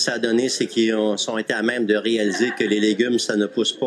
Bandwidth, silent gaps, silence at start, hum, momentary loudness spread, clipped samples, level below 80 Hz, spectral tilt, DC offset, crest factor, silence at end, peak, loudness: 12.5 kHz; none; 0 s; none; 3 LU; under 0.1%; -78 dBFS; -3.5 dB/octave; under 0.1%; 16 dB; 0 s; -4 dBFS; -20 LUFS